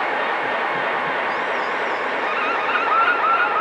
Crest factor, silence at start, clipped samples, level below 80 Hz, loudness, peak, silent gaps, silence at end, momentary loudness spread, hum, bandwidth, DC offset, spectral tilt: 16 dB; 0 s; under 0.1%; -68 dBFS; -20 LUFS; -6 dBFS; none; 0 s; 5 LU; none; 10.5 kHz; under 0.1%; -3.5 dB/octave